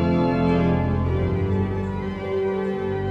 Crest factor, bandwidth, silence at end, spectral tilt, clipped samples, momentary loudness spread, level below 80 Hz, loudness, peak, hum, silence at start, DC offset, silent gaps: 12 dB; 6.4 kHz; 0 s; -9.5 dB/octave; under 0.1%; 7 LU; -36 dBFS; -23 LUFS; -10 dBFS; none; 0 s; under 0.1%; none